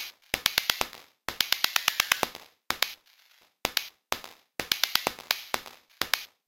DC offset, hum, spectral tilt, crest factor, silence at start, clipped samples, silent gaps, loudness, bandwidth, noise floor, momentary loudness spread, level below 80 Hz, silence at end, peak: under 0.1%; none; 0 dB/octave; 26 dB; 0 s; under 0.1%; none; -28 LUFS; 17 kHz; -63 dBFS; 14 LU; -60 dBFS; 0.2 s; -4 dBFS